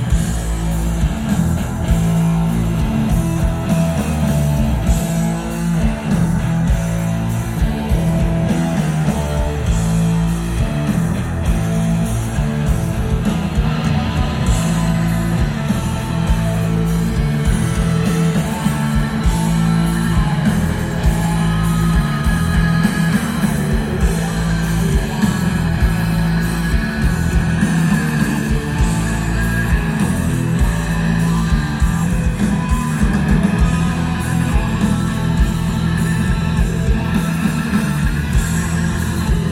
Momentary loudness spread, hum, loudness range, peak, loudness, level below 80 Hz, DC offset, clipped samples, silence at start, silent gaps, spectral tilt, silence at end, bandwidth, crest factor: 3 LU; none; 1 LU; -2 dBFS; -17 LUFS; -22 dBFS; under 0.1%; under 0.1%; 0 s; none; -6.5 dB/octave; 0 s; 16 kHz; 14 dB